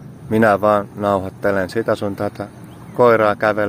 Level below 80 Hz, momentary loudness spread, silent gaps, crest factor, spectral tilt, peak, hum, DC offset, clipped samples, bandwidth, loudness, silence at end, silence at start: -52 dBFS; 12 LU; none; 18 dB; -7 dB/octave; 0 dBFS; none; under 0.1%; under 0.1%; 16 kHz; -17 LUFS; 0 s; 0 s